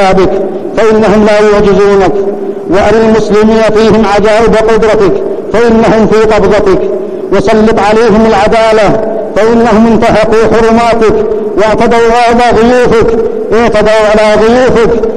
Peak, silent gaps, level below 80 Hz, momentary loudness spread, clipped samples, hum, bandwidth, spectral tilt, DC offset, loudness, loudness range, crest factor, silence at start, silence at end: 0 dBFS; none; -24 dBFS; 5 LU; 2%; none; 10.5 kHz; -6 dB/octave; under 0.1%; -6 LUFS; 1 LU; 6 dB; 0 s; 0 s